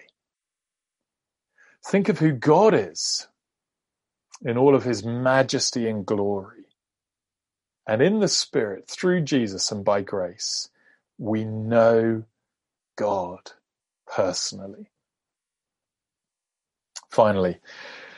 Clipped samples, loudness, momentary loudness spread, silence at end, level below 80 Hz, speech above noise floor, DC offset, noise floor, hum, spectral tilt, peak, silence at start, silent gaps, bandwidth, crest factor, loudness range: under 0.1%; -23 LUFS; 16 LU; 0.05 s; -68 dBFS; 67 dB; under 0.1%; -89 dBFS; none; -4.5 dB/octave; -4 dBFS; 1.85 s; none; 11.5 kHz; 22 dB; 8 LU